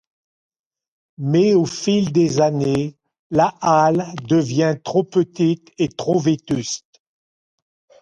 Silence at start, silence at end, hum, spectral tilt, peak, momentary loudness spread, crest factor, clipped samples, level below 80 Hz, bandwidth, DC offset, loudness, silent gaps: 1.2 s; 1.25 s; none; -6 dB/octave; -2 dBFS; 8 LU; 16 dB; under 0.1%; -56 dBFS; 9.8 kHz; under 0.1%; -19 LUFS; 3.19-3.30 s